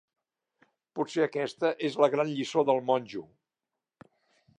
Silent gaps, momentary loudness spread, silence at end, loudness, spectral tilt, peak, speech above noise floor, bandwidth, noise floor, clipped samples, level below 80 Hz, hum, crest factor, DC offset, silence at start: none; 13 LU; 1.35 s; -28 LUFS; -5.5 dB/octave; -10 dBFS; 61 dB; 10.5 kHz; -89 dBFS; under 0.1%; -80 dBFS; none; 20 dB; under 0.1%; 0.95 s